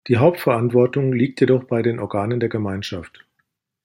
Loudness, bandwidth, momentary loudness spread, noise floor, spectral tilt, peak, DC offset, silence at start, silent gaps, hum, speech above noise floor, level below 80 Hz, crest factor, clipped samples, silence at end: -19 LUFS; 16.5 kHz; 9 LU; -72 dBFS; -8 dB/octave; -2 dBFS; under 0.1%; 0.05 s; none; none; 53 dB; -58 dBFS; 18 dB; under 0.1%; 0.75 s